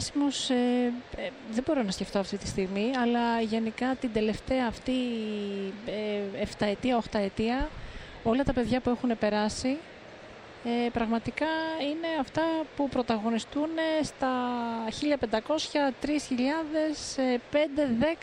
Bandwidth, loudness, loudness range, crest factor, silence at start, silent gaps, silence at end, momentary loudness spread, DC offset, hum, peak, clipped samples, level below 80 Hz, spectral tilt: 11 kHz; -29 LUFS; 2 LU; 18 dB; 0 s; none; 0 s; 7 LU; under 0.1%; none; -10 dBFS; under 0.1%; -50 dBFS; -5 dB/octave